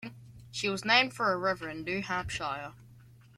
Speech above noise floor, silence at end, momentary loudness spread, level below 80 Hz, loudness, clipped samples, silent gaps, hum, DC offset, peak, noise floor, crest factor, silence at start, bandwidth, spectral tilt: 25 dB; 0.25 s; 16 LU; -58 dBFS; -30 LUFS; under 0.1%; none; none; under 0.1%; -8 dBFS; -56 dBFS; 24 dB; 0 s; 16 kHz; -3.5 dB/octave